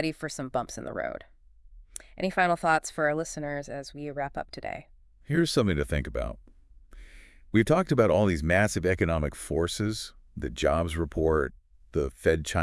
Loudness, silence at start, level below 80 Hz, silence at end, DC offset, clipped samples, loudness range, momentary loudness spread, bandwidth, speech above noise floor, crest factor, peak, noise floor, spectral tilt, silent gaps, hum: -28 LUFS; 0 s; -44 dBFS; 0 s; under 0.1%; under 0.1%; 5 LU; 14 LU; 12 kHz; 25 dB; 20 dB; -8 dBFS; -53 dBFS; -5.5 dB/octave; none; none